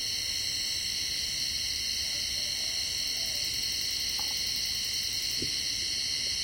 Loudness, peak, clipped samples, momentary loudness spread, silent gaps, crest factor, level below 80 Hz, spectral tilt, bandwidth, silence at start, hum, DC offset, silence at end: -29 LUFS; -18 dBFS; under 0.1%; 1 LU; none; 14 dB; -54 dBFS; 0.5 dB/octave; 17 kHz; 0 s; none; under 0.1%; 0 s